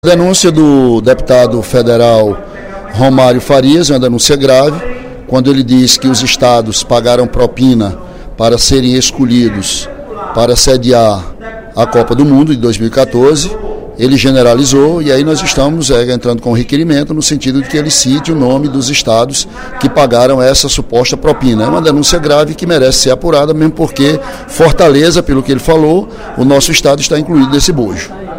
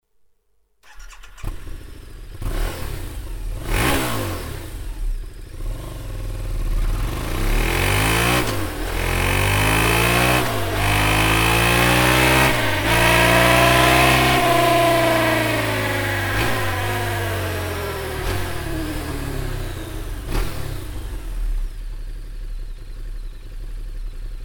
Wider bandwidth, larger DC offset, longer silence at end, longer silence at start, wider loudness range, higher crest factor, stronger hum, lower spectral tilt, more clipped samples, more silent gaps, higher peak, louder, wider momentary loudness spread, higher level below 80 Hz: second, 16.5 kHz vs over 20 kHz; neither; about the same, 0 s vs 0 s; second, 0.05 s vs 0.85 s; second, 2 LU vs 17 LU; second, 8 dB vs 20 dB; neither; about the same, -4.5 dB/octave vs -4 dB/octave; first, 1% vs under 0.1%; neither; about the same, 0 dBFS vs 0 dBFS; first, -8 LUFS vs -18 LUFS; second, 8 LU vs 22 LU; about the same, -26 dBFS vs -28 dBFS